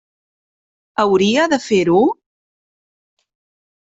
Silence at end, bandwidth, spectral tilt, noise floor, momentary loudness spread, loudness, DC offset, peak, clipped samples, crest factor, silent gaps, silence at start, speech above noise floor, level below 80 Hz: 1.85 s; 8 kHz; -5 dB/octave; under -90 dBFS; 9 LU; -15 LUFS; under 0.1%; -2 dBFS; under 0.1%; 16 dB; none; 1 s; over 76 dB; -60 dBFS